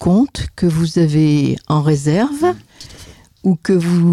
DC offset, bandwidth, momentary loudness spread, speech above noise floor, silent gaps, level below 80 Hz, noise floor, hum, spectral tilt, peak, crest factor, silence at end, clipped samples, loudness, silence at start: under 0.1%; 12.5 kHz; 7 LU; 27 dB; none; -40 dBFS; -41 dBFS; none; -7.5 dB/octave; -4 dBFS; 10 dB; 0 s; under 0.1%; -16 LUFS; 0 s